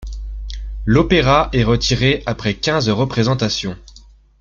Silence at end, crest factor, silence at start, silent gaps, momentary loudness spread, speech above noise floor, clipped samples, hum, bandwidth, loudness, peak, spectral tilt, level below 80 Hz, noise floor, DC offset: 0.4 s; 16 dB; 0 s; none; 17 LU; 29 dB; under 0.1%; none; 7.6 kHz; -16 LUFS; -2 dBFS; -5.5 dB/octave; -30 dBFS; -44 dBFS; under 0.1%